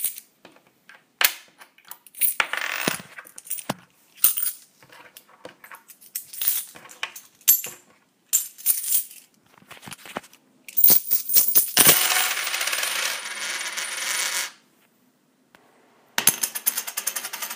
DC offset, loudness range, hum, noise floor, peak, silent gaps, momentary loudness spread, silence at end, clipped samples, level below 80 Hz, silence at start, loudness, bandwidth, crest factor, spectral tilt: under 0.1%; 10 LU; none; -63 dBFS; 0 dBFS; none; 22 LU; 0 s; under 0.1%; -68 dBFS; 0 s; -20 LUFS; 16.5 kHz; 26 dB; 0.5 dB/octave